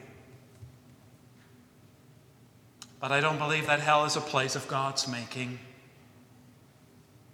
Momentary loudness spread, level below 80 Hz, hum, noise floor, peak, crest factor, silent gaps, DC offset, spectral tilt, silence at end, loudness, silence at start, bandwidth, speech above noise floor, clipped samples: 25 LU; -72 dBFS; none; -58 dBFS; -10 dBFS; 24 dB; none; under 0.1%; -3.5 dB/octave; 1.6 s; -28 LUFS; 0 s; 18.5 kHz; 29 dB; under 0.1%